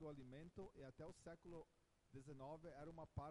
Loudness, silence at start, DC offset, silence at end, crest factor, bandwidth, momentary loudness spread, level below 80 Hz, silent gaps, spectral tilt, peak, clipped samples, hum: -59 LUFS; 0 s; under 0.1%; 0 s; 20 dB; 11 kHz; 5 LU; -72 dBFS; none; -7 dB/octave; -38 dBFS; under 0.1%; none